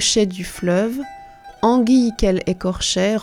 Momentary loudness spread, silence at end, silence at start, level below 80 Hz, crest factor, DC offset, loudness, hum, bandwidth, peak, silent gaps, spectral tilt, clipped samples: 9 LU; 0 s; 0 s; -36 dBFS; 16 dB; under 0.1%; -18 LUFS; none; 15.5 kHz; -4 dBFS; none; -4 dB/octave; under 0.1%